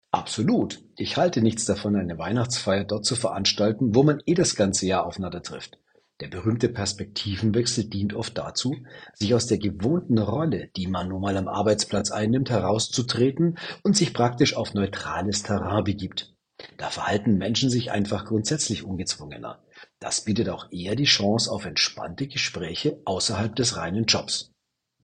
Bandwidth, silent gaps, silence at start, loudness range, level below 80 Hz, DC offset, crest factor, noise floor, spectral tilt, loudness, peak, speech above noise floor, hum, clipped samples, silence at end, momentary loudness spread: 10 kHz; none; 0.15 s; 4 LU; -54 dBFS; under 0.1%; 20 dB; -77 dBFS; -4.5 dB/octave; -24 LUFS; -6 dBFS; 52 dB; none; under 0.1%; 0.6 s; 11 LU